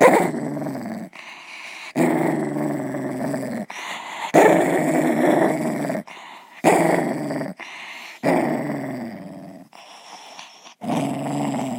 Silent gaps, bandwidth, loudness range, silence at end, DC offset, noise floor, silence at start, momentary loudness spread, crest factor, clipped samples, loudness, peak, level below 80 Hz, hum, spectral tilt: none; 16.5 kHz; 8 LU; 0 s; under 0.1%; -44 dBFS; 0 s; 22 LU; 22 dB; under 0.1%; -22 LUFS; 0 dBFS; -70 dBFS; none; -5.5 dB/octave